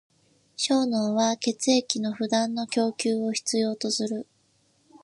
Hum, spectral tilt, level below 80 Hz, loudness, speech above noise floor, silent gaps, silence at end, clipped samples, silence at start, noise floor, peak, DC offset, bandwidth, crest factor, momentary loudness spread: none; -3.5 dB/octave; -78 dBFS; -26 LUFS; 41 dB; none; 0.8 s; under 0.1%; 0.6 s; -66 dBFS; -4 dBFS; under 0.1%; 11.5 kHz; 22 dB; 5 LU